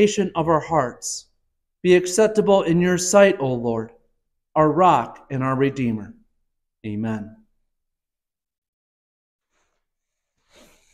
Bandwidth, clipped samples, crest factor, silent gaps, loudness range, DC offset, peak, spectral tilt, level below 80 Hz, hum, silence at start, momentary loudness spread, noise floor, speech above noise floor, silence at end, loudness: 14.5 kHz; under 0.1%; 20 dB; none; 17 LU; under 0.1%; -2 dBFS; -5 dB/octave; -56 dBFS; none; 0 s; 15 LU; -88 dBFS; 69 dB; 3.65 s; -20 LUFS